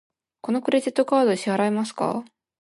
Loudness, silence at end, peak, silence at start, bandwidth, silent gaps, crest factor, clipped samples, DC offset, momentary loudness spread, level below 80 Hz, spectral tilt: -23 LUFS; 0.35 s; -8 dBFS; 0.45 s; 11.5 kHz; none; 16 dB; under 0.1%; under 0.1%; 8 LU; -74 dBFS; -5.5 dB/octave